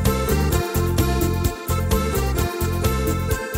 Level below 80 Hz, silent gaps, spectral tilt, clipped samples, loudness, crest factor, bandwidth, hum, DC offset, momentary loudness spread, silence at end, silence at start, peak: -26 dBFS; none; -5.5 dB/octave; under 0.1%; -22 LUFS; 14 dB; 16.5 kHz; none; under 0.1%; 3 LU; 0 s; 0 s; -6 dBFS